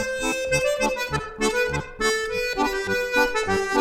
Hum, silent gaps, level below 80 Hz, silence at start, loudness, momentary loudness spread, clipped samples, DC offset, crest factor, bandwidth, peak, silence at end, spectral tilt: none; none; -42 dBFS; 0 s; -23 LUFS; 4 LU; under 0.1%; under 0.1%; 16 dB; 17.5 kHz; -6 dBFS; 0 s; -3 dB/octave